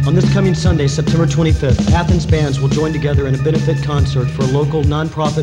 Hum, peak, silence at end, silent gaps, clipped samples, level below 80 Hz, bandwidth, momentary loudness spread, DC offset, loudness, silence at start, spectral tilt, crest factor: none; 0 dBFS; 0 s; none; under 0.1%; -24 dBFS; 10 kHz; 3 LU; 0.2%; -15 LUFS; 0 s; -7 dB/octave; 14 dB